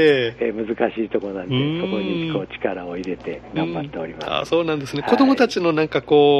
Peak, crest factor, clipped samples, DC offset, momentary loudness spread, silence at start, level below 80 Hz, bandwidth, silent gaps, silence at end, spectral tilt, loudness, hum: -2 dBFS; 18 dB; under 0.1%; under 0.1%; 12 LU; 0 s; -52 dBFS; 10.5 kHz; none; 0 s; -6.5 dB/octave; -21 LUFS; none